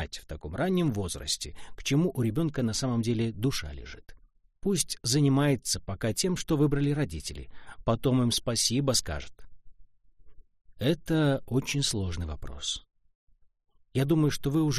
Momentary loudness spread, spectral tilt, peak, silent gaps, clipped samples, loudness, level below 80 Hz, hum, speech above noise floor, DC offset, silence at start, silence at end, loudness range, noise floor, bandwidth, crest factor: 13 LU; -5 dB/octave; -12 dBFS; 13.15-13.27 s; under 0.1%; -28 LUFS; -46 dBFS; none; 20 dB; under 0.1%; 0 s; 0 s; 3 LU; -48 dBFS; 15.5 kHz; 16 dB